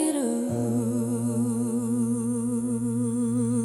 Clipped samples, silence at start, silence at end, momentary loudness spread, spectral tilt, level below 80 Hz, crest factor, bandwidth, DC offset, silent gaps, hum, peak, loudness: under 0.1%; 0 s; 0 s; 2 LU; -7 dB/octave; -64 dBFS; 14 dB; 13 kHz; under 0.1%; none; none; -12 dBFS; -26 LUFS